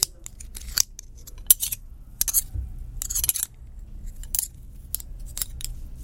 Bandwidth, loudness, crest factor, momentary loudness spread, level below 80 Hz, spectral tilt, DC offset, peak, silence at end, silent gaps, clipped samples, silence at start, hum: 17 kHz; -25 LUFS; 28 dB; 24 LU; -38 dBFS; 0 dB/octave; under 0.1%; 0 dBFS; 0 s; none; under 0.1%; 0 s; none